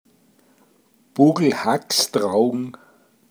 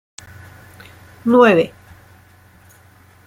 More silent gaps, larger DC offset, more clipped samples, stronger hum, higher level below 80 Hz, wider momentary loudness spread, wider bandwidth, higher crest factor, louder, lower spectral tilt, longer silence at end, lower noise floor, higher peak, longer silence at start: neither; neither; neither; neither; second, -76 dBFS vs -58 dBFS; second, 14 LU vs 28 LU; first, over 20 kHz vs 15.5 kHz; about the same, 20 dB vs 18 dB; second, -19 LUFS vs -14 LUFS; second, -4.5 dB/octave vs -6 dB/octave; second, 0.6 s vs 1.6 s; first, -59 dBFS vs -48 dBFS; about the same, -2 dBFS vs -2 dBFS; about the same, 1.15 s vs 1.25 s